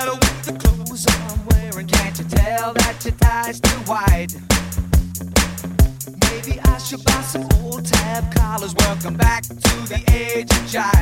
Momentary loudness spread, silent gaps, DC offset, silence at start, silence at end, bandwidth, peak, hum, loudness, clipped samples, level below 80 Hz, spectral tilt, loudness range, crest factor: 2 LU; none; under 0.1%; 0 s; 0 s; 17 kHz; 0 dBFS; none; -19 LUFS; under 0.1%; -22 dBFS; -4.5 dB/octave; 1 LU; 18 dB